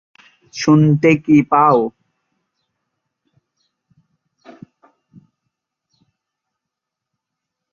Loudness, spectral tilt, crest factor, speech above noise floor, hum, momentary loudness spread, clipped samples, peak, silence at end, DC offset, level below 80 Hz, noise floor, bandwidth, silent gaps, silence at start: -14 LUFS; -7 dB/octave; 18 dB; 70 dB; none; 12 LU; under 0.1%; 0 dBFS; 5.85 s; under 0.1%; -60 dBFS; -82 dBFS; 7.2 kHz; none; 0.55 s